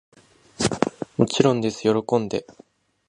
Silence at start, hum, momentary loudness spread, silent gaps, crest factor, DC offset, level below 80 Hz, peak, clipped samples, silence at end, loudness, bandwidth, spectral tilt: 0.6 s; none; 7 LU; none; 22 dB; under 0.1%; -54 dBFS; -2 dBFS; under 0.1%; 0.55 s; -23 LUFS; 11.5 kHz; -5.5 dB/octave